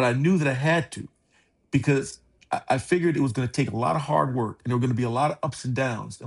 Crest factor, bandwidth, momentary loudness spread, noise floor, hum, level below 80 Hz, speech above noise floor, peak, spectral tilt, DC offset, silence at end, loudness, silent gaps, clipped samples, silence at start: 16 dB; 11.5 kHz; 9 LU; -65 dBFS; none; -58 dBFS; 41 dB; -8 dBFS; -6.5 dB/octave; under 0.1%; 0 s; -25 LUFS; none; under 0.1%; 0 s